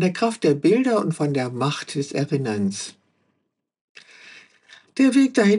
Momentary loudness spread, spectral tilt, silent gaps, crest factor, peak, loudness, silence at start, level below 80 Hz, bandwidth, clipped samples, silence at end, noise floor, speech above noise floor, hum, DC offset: 10 LU; -6 dB/octave; 3.81-3.95 s; 16 dB; -6 dBFS; -21 LUFS; 0 s; -80 dBFS; 11 kHz; under 0.1%; 0 s; -75 dBFS; 55 dB; none; under 0.1%